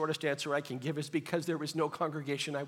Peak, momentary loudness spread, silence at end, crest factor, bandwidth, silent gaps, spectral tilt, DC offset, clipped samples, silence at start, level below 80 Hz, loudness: -14 dBFS; 3 LU; 0 s; 20 dB; 17 kHz; none; -5 dB/octave; under 0.1%; under 0.1%; 0 s; -84 dBFS; -35 LUFS